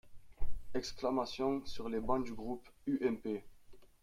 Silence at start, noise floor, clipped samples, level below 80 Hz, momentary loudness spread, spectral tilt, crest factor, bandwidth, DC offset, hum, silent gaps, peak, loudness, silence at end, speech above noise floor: 0.05 s; -55 dBFS; under 0.1%; -50 dBFS; 9 LU; -5.5 dB/octave; 16 dB; 12.5 kHz; under 0.1%; none; none; -20 dBFS; -39 LUFS; 0.2 s; 19 dB